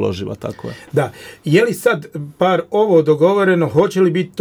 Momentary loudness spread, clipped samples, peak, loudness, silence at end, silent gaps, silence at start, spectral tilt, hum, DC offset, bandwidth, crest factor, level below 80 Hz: 14 LU; under 0.1%; -2 dBFS; -16 LUFS; 0 s; none; 0 s; -6.5 dB/octave; none; under 0.1%; over 20 kHz; 14 dB; -54 dBFS